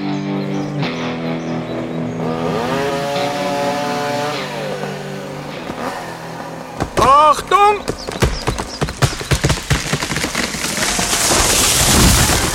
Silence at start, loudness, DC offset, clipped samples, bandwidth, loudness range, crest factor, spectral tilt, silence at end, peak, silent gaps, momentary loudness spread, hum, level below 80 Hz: 0 s; -16 LUFS; under 0.1%; under 0.1%; 16.5 kHz; 7 LU; 18 dB; -3.5 dB/octave; 0 s; 0 dBFS; none; 15 LU; none; -30 dBFS